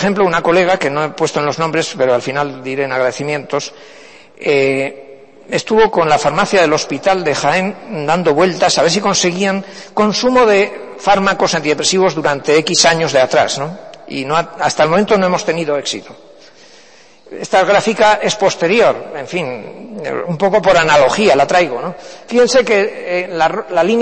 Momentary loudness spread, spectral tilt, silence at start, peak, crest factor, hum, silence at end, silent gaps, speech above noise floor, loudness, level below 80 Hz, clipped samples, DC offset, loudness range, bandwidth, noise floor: 11 LU; -3.5 dB/octave; 0 s; 0 dBFS; 14 dB; none; 0 s; none; 31 dB; -14 LUFS; -48 dBFS; under 0.1%; under 0.1%; 4 LU; 8.8 kHz; -44 dBFS